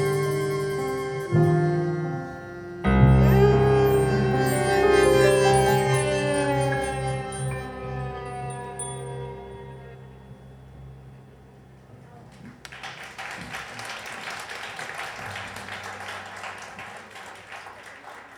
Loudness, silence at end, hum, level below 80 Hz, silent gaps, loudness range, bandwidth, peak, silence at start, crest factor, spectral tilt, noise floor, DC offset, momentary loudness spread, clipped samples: -24 LUFS; 0 s; none; -38 dBFS; none; 20 LU; 17.5 kHz; -4 dBFS; 0 s; 20 dB; -6 dB/octave; -49 dBFS; under 0.1%; 23 LU; under 0.1%